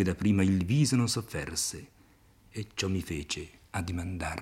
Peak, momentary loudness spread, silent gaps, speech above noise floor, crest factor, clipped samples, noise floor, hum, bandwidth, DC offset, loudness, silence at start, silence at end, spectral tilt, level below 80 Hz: -14 dBFS; 13 LU; none; 31 dB; 16 dB; under 0.1%; -60 dBFS; none; 16.5 kHz; under 0.1%; -30 LUFS; 0 s; 0 s; -5 dB/octave; -54 dBFS